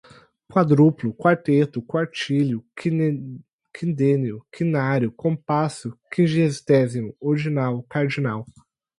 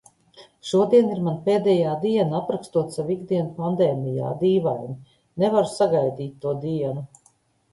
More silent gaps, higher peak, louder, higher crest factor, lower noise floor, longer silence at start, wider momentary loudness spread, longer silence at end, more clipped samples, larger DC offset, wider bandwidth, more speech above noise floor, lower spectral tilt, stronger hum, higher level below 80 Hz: first, 3.53-3.59 s vs none; about the same, -4 dBFS vs -6 dBFS; about the same, -22 LUFS vs -23 LUFS; about the same, 18 dB vs 18 dB; second, -49 dBFS vs -62 dBFS; about the same, 0.5 s vs 0.4 s; second, 9 LU vs 12 LU; about the same, 0.55 s vs 0.65 s; neither; neither; about the same, 11 kHz vs 11.5 kHz; second, 28 dB vs 40 dB; about the same, -7.5 dB/octave vs -7.5 dB/octave; neither; about the same, -62 dBFS vs -62 dBFS